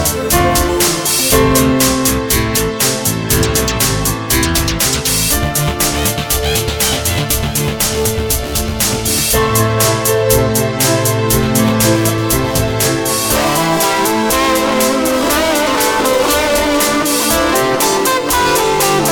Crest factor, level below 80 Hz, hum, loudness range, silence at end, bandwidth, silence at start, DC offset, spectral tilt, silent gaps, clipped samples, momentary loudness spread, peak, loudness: 14 dB; -26 dBFS; none; 2 LU; 0 s; 19.5 kHz; 0 s; under 0.1%; -3.5 dB/octave; none; under 0.1%; 3 LU; 0 dBFS; -13 LUFS